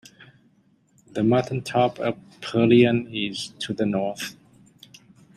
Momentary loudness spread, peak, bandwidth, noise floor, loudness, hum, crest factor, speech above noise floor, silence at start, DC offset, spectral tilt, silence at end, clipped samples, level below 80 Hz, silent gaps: 15 LU; -4 dBFS; 14 kHz; -61 dBFS; -23 LUFS; none; 20 dB; 39 dB; 1.15 s; under 0.1%; -6 dB/octave; 1.05 s; under 0.1%; -62 dBFS; none